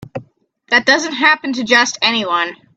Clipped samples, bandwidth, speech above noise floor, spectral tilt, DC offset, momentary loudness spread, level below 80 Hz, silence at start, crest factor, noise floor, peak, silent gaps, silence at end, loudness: under 0.1%; 9.4 kHz; 36 dB; -2 dB/octave; under 0.1%; 7 LU; -62 dBFS; 0.15 s; 16 dB; -51 dBFS; 0 dBFS; none; 0.25 s; -13 LUFS